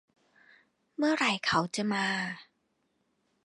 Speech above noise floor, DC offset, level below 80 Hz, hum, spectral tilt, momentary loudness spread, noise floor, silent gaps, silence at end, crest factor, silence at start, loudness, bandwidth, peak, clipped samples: 47 dB; under 0.1%; -70 dBFS; none; -4 dB/octave; 13 LU; -76 dBFS; none; 1 s; 22 dB; 1 s; -29 LUFS; 11.5 kHz; -12 dBFS; under 0.1%